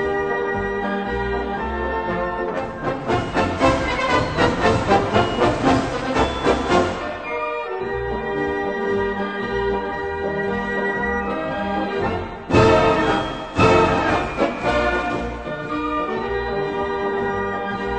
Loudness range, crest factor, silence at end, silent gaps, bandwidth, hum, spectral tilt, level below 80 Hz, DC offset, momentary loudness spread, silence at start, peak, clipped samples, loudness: 5 LU; 18 dB; 0 s; none; 9 kHz; none; -6 dB/octave; -36 dBFS; 0.2%; 8 LU; 0 s; -2 dBFS; under 0.1%; -21 LUFS